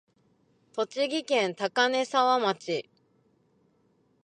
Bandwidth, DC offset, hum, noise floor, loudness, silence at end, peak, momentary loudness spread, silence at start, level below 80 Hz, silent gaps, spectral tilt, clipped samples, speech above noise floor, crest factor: 9.8 kHz; under 0.1%; none; -68 dBFS; -27 LUFS; 1.4 s; -10 dBFS; 10 LU; 0.75 s; -84 dBFS; none; -3 dB/octave; under 0.1%; 41 dB; 20 dB